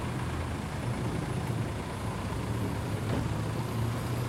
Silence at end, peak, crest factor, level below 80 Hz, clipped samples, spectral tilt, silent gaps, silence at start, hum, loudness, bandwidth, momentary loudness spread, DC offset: 0 s; -18 dBFS; 14 dB; -44 dBFS; under 0.1%; -6.5 dB/octave; none; 0 s; none; -33 LUFS; 16 kHz; 3 LU; under 0.1%